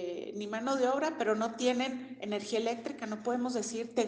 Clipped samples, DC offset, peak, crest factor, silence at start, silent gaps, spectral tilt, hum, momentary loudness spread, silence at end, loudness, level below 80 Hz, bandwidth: under 0.1%; under 0.1%; -18 dBFS; 16 dB; 0 s; none; -3.5 dB/octave; none; 8 LU; 0 s; -33 LUFS; -78 dBFS; 10 kHz